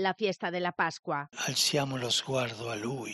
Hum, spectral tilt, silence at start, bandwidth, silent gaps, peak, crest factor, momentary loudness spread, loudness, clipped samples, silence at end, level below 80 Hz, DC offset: none; -3 dB/octave; 0 s; 13 kHz; 0.99-1.03 s; -14 dBFS; 18 dB; 9 LU; -30 LUFS; under 0.1%; 0 s; -72 dBFS; under 0.1%